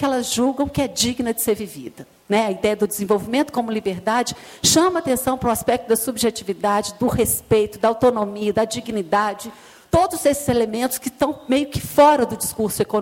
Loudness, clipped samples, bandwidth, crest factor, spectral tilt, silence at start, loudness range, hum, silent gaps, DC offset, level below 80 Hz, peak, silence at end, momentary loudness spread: -20 LUFS; under 0.1%; 17 kHz; 18 dB; -4 dB/octave; 0 s; 2 LU; none; none; under 0.1%; -46 dBFS; -2 dBFS; 0 s; 7 LU